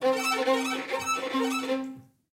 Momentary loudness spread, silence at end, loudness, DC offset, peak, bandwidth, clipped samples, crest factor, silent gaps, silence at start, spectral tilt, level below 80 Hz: 6 LU; 0.3 s; -28 LUFS; under 0.1%; -12 dBFS; 16.5 kHz; under 0.1%; 16 dB; none; 0 s; -2 dB/octave; -76 dBFS